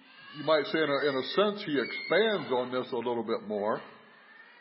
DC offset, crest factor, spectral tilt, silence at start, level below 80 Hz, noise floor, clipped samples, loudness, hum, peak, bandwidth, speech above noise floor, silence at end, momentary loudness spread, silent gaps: under 0.1%; 18 dB; -8.5 dB/octave; 0.15 s; -84 dBFS; -55 dBFS; under 0.1%; -30 LUFS; none; -12 dBFS; 5.8 kHz; 25 dB; 0.2 s; 7 LU; none